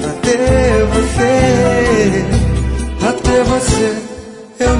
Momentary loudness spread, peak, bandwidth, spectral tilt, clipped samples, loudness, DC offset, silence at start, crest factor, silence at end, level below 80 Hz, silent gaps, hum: 8 LU; 0 dBFS; 11 kHz; -5.5 dB/octave; under 0.1%; -13 LUFS; under 0.1%; 0 s; 12 dB; 0 s; -22 dBFS; none; none